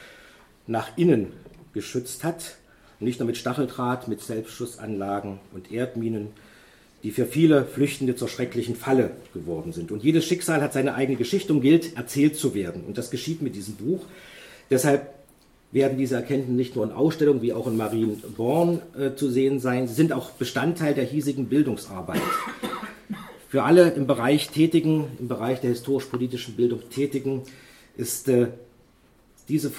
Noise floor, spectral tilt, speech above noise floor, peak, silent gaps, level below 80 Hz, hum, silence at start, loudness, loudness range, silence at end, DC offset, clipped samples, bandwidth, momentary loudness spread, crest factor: -58 dBFS; -6 dB/octave; 34 dB; -2 dBFS; none; -60 dBFS; none; 0 s; -25 LUFS; 7 LU; 0 s; under 0.1%; under 0.1%; 16.5 kHz; 12 LU; 22 dB